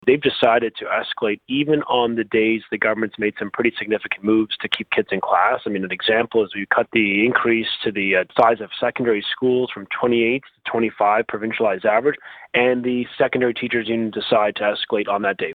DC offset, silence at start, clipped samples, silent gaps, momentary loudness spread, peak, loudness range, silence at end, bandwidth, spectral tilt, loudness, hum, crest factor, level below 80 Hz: under 0.1%; 0.05 s; under 0.1%; none; 6 LU; 0 dBFS; 2 LU; 0 s; 4.8 kHz; -7 dB/octave; -20 LUFS; none; 18 dB; -60 dBFS